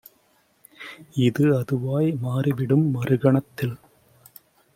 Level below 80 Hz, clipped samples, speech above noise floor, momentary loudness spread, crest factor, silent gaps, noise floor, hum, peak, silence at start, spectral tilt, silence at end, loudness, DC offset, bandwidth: -62 dBFS; under 0.1%; 41 dB; 18 LU; 18 dB; none; -63 dBFS; none; -6 dBFS; 0.8 s; -8.5 dB/octave; 1 s; -23 LUFS; under 0.1%; 16.5 kHz